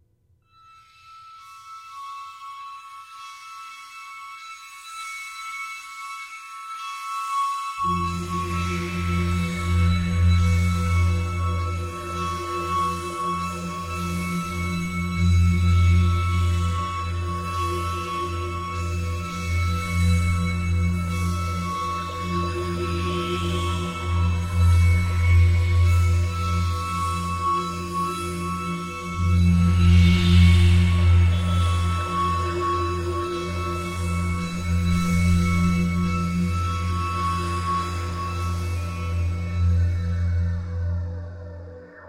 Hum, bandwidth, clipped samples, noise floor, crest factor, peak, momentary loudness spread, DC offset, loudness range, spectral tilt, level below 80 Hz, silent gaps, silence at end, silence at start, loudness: none; 12.5 kHz; under 0.1%; -63 dBFS; 16 dB; -6 dBFS; 18 LU; under 0.1%; 15 LU; -6 dB/octave; -32 dBFS; none; 0 s; 1.05 s; -23 LUFS